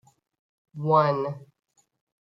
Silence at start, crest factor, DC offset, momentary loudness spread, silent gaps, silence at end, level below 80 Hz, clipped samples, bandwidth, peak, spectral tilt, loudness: 0.75 s; 20 dB; under 0.1%; 21 LU; none; 0.8 s; -74 dBFS; under 0.1%; 7.4 kHz; -8 dBFS; -8.5 dB/octave; -24 LUFS